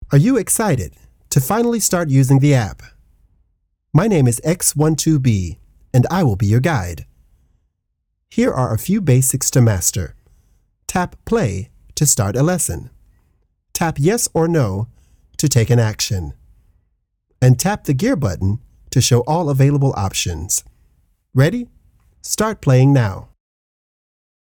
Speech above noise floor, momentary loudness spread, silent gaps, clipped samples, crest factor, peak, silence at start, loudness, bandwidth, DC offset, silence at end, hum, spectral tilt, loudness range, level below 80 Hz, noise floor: 57 dB; 13 LU; none; under 0.1%; 18 dB; 0 dBFS; 0 s; -17 LUFS; 19.5 kHz; under 0.1%; 1.35 s; none; -5.5 dB/octave; 3 LU; -42 dBFS; -72 dBFS